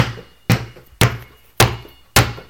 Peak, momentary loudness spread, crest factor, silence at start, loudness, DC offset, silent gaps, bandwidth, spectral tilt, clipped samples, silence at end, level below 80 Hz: 0 dBFS; 17 LU; 20 dB; 0 s; -18 LUFS; under 0.1%; none; over 20 kHz; -4 dB/octave; under 0.1%; 0.1 s; -34 dBFS